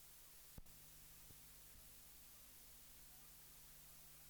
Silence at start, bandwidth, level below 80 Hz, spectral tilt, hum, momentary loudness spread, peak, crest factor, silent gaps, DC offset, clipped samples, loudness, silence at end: 0 s; over 20 kHz; -70 dBFS; -2 dB/octave; none; 0 LU; -42 dBFS; 18 dB; none; under 0.1%; under 0.1%; -59 LUFS; 0 s